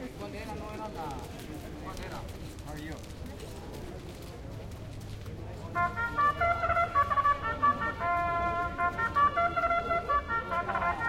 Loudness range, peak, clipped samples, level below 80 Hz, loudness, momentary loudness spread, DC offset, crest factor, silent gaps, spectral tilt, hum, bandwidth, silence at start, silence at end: 14 LU; -16 dBFS; under 0.1%; -48 dBFS; -30 LUFS; 16 LU; under 0.1%; 16 dB; none; -5.5 dB/octave; none; 16.5 kHz; 0 s; 0 s